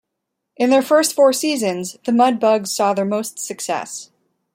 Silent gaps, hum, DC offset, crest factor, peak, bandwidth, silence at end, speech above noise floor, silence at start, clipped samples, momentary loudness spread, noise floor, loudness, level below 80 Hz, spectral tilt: none; none; under 0.1%; 16 dB; -2 dBFS; 16.5 kHz; 0.5 s; 61 dB; 0.6 s; under 0.1%; 11 LU; -78 dBFS; -18 LUFS; -70 dBFS; -3.5 dB/octave